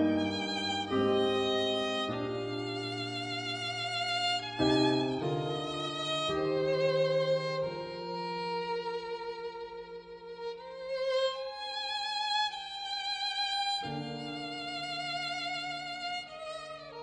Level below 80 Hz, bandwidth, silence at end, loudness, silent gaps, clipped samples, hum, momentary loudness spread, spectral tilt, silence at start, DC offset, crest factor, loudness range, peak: -64 dBFS; 10.5 kHz; 0 s; -33 LUFS; none; under 0.1%; none; 12 LU; -4.5 dB/octave; 0 s; under 0.1%; 18 dB; 6 LU; -16 dBFS